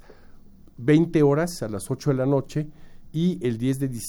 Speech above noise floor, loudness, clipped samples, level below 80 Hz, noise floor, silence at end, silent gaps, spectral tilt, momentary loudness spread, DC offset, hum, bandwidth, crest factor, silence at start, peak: 23 dB; -24 LUFS; under 0.1%; -48 dBFS; -46 dBFS; 0 s; none; -7 dB/octave; 12 LU; under 0.1%; none; 18 kHz; 16 dB; 0.1 s; -8 dBFS